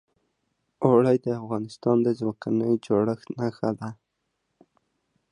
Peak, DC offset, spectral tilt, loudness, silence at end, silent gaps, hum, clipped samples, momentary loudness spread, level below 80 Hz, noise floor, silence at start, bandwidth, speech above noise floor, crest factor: -6 dBFS; under 0.1%; -8.5 dB/octave; -25 LUFS; 1.4 s; none; none; under 0.1%; 10 LU; -66 dBFS; -78 dBFS; 0.8 s; 10.5 kHz; 54 dB; 20 dB